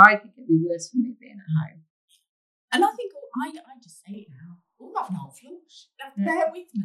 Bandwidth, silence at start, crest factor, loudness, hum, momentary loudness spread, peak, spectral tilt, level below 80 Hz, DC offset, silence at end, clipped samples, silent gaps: 13 kHz; 0 s; 24 dB; -25 LUFS; none; 20 LU; 0 dBFS; -5.5 dB/octave; -82 dBFS; under 0.1%; 0 s; under 0.1%; 1.90-2.08 s, 2.29-2.68 s